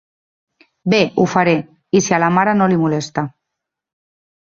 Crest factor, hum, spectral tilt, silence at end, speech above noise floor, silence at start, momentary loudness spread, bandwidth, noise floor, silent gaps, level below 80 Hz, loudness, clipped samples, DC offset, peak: 16 dB; none; -5.5 dB/octave; 1.1 s; 66 dB; 0.85 s; 10 LU; 7.6 kHz; -80 dBFS; none; -56 dBFS; -16 LUFS; under 0.1%; under 0.1%; 0 dBFS